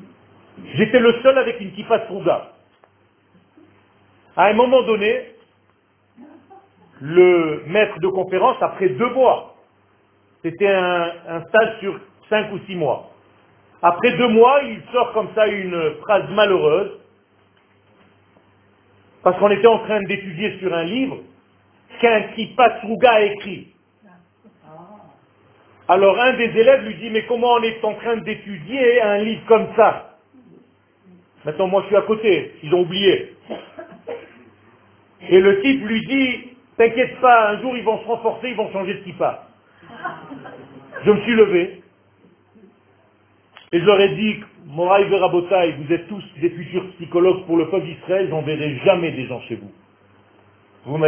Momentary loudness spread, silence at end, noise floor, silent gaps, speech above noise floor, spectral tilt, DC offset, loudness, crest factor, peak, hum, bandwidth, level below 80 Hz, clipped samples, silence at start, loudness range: 16 LU; 0 s; -60 dBFS; none; 42 dB; -9.5 dB/octave; under 0.1%; -18 LUFS; 20 dB; 0 dBFS; none; 3.6 kHz; -58 dBFS; under 0.1%; 0.55 s; 4 LU